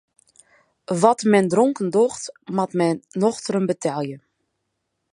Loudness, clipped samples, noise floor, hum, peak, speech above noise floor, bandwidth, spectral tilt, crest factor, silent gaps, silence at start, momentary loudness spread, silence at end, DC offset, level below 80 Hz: -21 LUFS; under 0.1%; -76 dBFS; none; -2 dBFS; 56 dB; 11.5 kHz; -6 dB/octave; 20 dB; none; 0.9 s; 11 LU; 0.95 s; under 0.1%; -68 dBFS